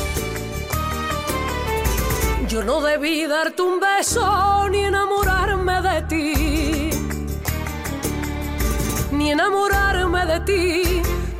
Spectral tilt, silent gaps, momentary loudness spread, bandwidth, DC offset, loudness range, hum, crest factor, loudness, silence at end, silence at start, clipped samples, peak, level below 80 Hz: -4.5 dB/octave; none; 8 LU; 16 kHz; 0.2%; 4 LU; none; 12 dB; -20 LUFS; 0 s; 0 s; under 0.1%; -8 dBFS; -28 dBFS